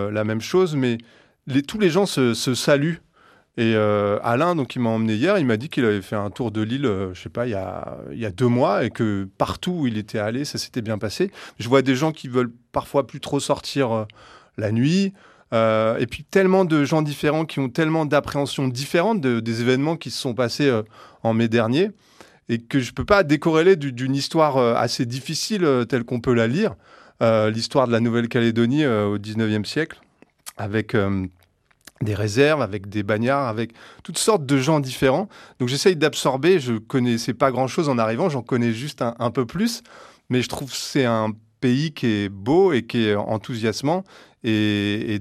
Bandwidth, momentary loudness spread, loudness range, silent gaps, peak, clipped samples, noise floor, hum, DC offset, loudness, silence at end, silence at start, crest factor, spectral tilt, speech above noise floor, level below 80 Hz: 14.5 kHz; 9 LU; 4 LU; none; -2 dBFS; under 0.1%; -60 dBFS; none; under 0.1%; -21 LUFS; 0 s; 0 s; 20 dB; -5.5 dB/octave; 39 dB; -54 dBFS